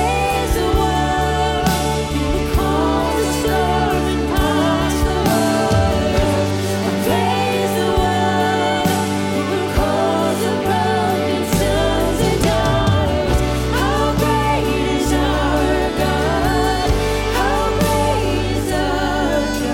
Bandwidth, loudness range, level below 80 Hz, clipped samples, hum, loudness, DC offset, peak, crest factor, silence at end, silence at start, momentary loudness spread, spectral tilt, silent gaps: 17 kHz; 1 LU; -26 dBFS; under 0.1%; none; -17 LUFS; under 0.1%; -4 dBFS; 12 dB; 0 s; 0 s; 3 LU; -5 dB/octave; none